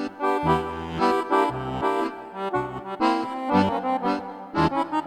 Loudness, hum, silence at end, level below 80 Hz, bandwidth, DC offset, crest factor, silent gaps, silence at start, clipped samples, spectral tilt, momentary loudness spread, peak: -25 LUFS; none; 0 s; -50 dBFS; 14 kHz; under 0.1%; 16 dB; none; 0 s; under 0.1%; -6.5 dB/octave; 8 LU; -8 dBFS